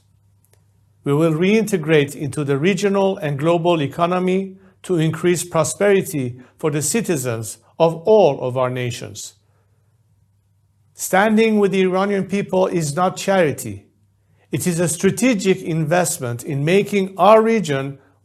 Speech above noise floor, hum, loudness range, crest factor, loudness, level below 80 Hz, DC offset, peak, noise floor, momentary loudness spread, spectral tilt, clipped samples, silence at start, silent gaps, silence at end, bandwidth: 42 dB; none; 3 LU; 18 dB; -18 LUFS; -60 dBFS; under 0.1%; 0 dBFS; -60 dBFS; 13 LU; -5.5 dB/octave; under 0.1%; 1.05 s; none; 0.3 s; 14 kHz